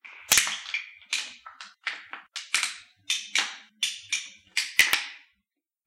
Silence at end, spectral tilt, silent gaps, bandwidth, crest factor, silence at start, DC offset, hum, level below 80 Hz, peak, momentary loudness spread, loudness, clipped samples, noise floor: 0.7 s; 2.5 dB/octave; none; 16 kHz; 28 dB; 0.05 s; under 0.1%; none; -64 dBFS; -4 dBFS; 18 LU; -26 LUFS; under 0.1%; -82 dBFS